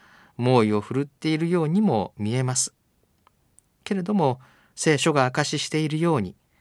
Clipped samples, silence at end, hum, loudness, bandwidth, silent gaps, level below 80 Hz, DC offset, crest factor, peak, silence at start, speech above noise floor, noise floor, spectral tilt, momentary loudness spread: under 0.1%; 0.3 s; none; -23 LUFS; 13 kHz; none; -66 dBFS; under 0.1%; 20 dB; -6 dBFS; 0.4 s; 44 dB; -66 dBFS; -5 dB/octave; 9 LU